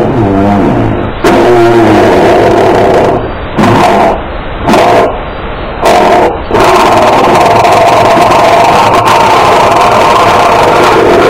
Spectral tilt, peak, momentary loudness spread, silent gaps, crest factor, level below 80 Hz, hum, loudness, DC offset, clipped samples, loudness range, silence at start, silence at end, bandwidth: -5.5 dB/octave; 0 dBFS; 7 LU; none; 6 dB; -24 dBFS; none; -5 LUFS; under 0.1%; 5%; 3 LU; 0 s; 0 s; 17 kHz